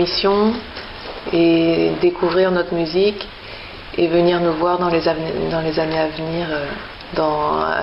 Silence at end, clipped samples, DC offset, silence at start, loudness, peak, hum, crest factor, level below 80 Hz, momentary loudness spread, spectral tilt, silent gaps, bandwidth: 0 s; under 0.1%; under 0.1%; 0 s; -18 LUFS; -4 dBFS; none; 16 dB; -42 dBFS; 15 LU; -8.5 dB/octave; none; 5.8 kHz